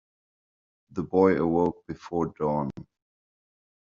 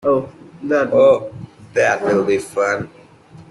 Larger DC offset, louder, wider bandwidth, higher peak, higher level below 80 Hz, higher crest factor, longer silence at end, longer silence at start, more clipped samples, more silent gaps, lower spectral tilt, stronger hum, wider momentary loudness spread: neither; second, -26 LUFS vs -17 LUFS; second, 7.2 kHz vs 12 kHz; second, -6 dBFS vs -2 dBFS; about the same, -60 dBFS vs -56 dBFS; first, 22 dB vs 16 dB; first, 1.05 s vs 0.1 s; first, 0.95 s vs 0.05 s; neither; neither; first, -8 dB/octave vs -5.5 dB/octave; neither; second, 16 LU vs 20 LU